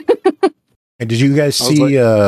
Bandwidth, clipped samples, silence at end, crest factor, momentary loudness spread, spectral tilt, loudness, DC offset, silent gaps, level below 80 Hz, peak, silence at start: 15 kHz; under 0.1%; 0 s; 12 dB; 8 LU; -5.5 dB/octave; -13 LUFS; under 0.1%; 0.76-0.99 s; -58 dBFS; -2 dBFS; 0.1 s